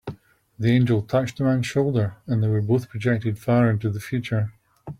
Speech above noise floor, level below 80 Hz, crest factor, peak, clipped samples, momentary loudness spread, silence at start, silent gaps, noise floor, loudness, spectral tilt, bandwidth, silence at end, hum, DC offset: 24 dB; -56 dBFS; 16 dB; -8 dBFS; under 0.1%; 7 LU; 0.05 s; none; -45 dBFS; -23 LUFS; -8 dB/octave; 13.5 kHz; 0.05 s; none; under 0.1%